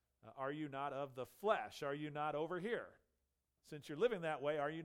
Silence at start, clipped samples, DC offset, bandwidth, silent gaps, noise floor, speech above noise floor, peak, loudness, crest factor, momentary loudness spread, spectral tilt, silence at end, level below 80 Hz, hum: 0.25 s; under 0.1%; under 0.1%; 16.5 kHz; none; -87 dBFS; 45 dB; -22 dBFS; -43 LUFS; 20 dB; 12 LU; -6 dB/octave; 0 s; -80 dBFS; none